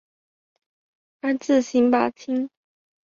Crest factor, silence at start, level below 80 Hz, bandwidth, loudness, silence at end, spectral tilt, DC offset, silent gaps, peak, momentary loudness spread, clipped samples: 18 dB; 1.25 s; -68 dBFS; 7.6 kHz; -22 LUFS; 0.6 s; -4.5 dB/octave; under 0.1%; none; -8 dBFS; 10 LU; under 0.1%